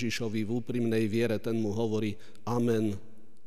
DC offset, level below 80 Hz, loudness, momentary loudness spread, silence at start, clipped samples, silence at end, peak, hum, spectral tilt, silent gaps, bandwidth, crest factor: 1%; -66 dBFS; -31 LUFS; 6 LU; 0 s; under 0.1%; 0.45 s; -18 dBFS; none; -6.5 dB/octave; none; 15.5 kHz; 14 dB